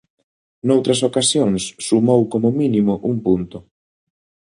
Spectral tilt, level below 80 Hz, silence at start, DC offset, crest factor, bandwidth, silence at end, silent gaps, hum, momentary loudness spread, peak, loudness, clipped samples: -5 dB/octave; -52 dBFS; 0.65 s; under 0.1%; 16 dB; 11 kHz; 0.9 s; none; none; 6 LU; -2 dBFS; -17 LUFS; under 0.1%